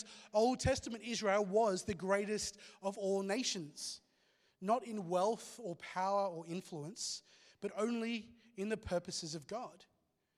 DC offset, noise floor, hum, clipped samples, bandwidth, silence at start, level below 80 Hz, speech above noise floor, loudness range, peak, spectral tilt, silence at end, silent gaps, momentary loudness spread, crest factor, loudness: under 0.1%; -75 dBFS; none; under 0.1%; 14 kHz; 0 s; -64 dBFS; 37 dB; 5 LU; -20 dBFS; -4 dB/octave; 0.55 s; none; 12 LU; 20 dB; -38 LUFS